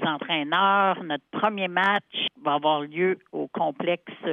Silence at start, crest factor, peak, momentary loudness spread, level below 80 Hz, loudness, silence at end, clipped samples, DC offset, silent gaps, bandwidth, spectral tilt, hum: 0 s; 16 dB; -8 dBFS; 9 LU; -80 dBFS; -25 LUFS; 0 s; under 0.1%; under 0.1%; none; 7.4 kHz; -6.5 dB/octave; none